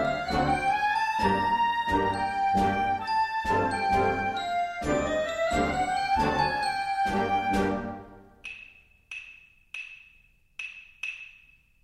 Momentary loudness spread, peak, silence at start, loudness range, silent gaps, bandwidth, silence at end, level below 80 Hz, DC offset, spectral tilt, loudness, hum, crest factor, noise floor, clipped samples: 16 LU; -12 dBFS; 0 s; 14 LU; none; 14 kHz; 0.55 s; -46 dBFS; under 0.1%; -5 dB/octave; -27 LUFS; none; 16 dB; -61 dBFS; under 0.1%